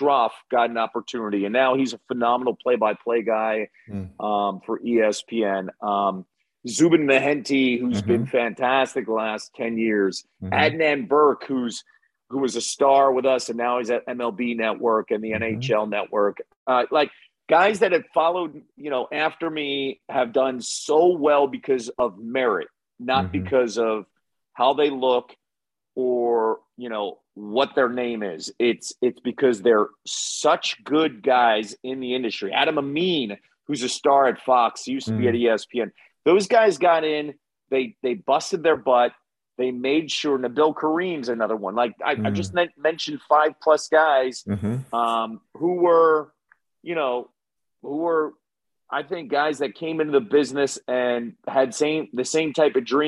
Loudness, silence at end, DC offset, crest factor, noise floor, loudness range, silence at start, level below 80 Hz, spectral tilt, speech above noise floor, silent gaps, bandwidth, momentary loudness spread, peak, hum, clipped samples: -22 LUFS; 0 s; under 0.1%; 18 dB; -89 dBFS; 3 LU; 0 s; -70 dBFS; -4.5 dB/octave; 67 dB; 16.56-16.66 s; 11.5 kHz; 10 LU; -4 dBFS; none; under 0.1%